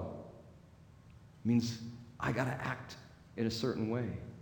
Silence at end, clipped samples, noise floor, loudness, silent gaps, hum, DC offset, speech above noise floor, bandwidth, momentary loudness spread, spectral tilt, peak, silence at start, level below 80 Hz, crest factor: 0 s; under 0.1%; -58 dBFS; -37 LUFS; none; none; under 0.1%; 23 dB; 19 kHz; 17 LU; -6 dB/octave; -18 dBFS; 0 s; -62 dBFS; 20 dB